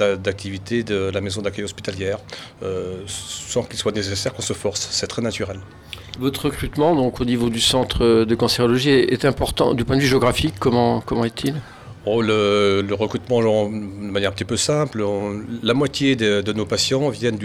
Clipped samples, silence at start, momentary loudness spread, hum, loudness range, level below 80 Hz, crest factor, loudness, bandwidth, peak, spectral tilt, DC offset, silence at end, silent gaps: under 0.1%; 0 s; 11 LU; none; 8 LU; -42 dBFS; 16 dB; -20 LUFS; 16.5 kHz; -4 dBFS; -4.5 dB/octave; under 0.1%; 0 s; none